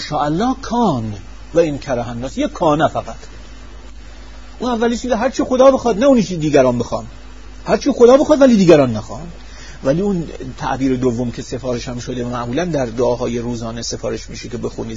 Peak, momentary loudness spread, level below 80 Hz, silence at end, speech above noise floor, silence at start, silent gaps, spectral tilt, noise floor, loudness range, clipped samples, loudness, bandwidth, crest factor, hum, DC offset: 0 dBFS; 16 LU; -36 dBFS; 0 s; 20 dB; 0 s; none; -6 dB/octave; -35 dBFS; 8 LU; under 0.1%; -16 LUFS; 7.8 kHz; 16 dB; none; 1%